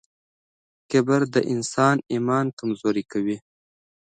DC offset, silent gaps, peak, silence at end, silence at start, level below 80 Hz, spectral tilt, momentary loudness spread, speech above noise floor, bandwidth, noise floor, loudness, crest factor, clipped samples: under 0.1%; 2.53-2.57 s; -6 dBFS; 0.75 s; 0.9 s; -68 dBFS; -6 dB/octave; 7 LU; over 68 dB; 9.4 kHz; under -90 dBFS; -23 LUFS; 18 dB; under 0.1%